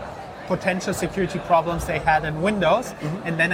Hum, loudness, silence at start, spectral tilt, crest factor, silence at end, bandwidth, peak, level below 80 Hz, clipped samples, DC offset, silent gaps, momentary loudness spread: none; -23 LUFS; 0 s; -5.5 dB/octave; 18 dB; 0 s; 16 kHz; -6 dBFS; -42 dBFS; under 0.1%; under 0.1%; none; 8 LU